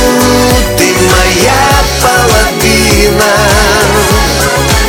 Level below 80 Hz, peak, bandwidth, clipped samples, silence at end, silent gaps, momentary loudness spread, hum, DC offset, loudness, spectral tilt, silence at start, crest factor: -16 dBFS; 0 dBFS; 19.5 kHz; 0.2%; 0 s; none; 2 LU; none; under 0.1%; -7 LUFS; -3.5 dB/octave; 0 s; 8 dB